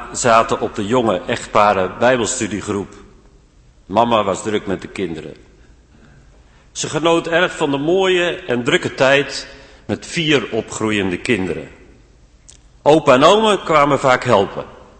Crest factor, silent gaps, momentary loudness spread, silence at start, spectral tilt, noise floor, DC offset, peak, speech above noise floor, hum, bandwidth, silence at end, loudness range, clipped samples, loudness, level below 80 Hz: 18 dB; none; 12 LU; 0 s; -4 dB/octave; -49 dBFS; under 0.1%; 0 dBFS; 33 dB; none; 8.8 kHz; 0.25 s; 7 LU; under 0.1%; -16 LUFS; -46 dBFS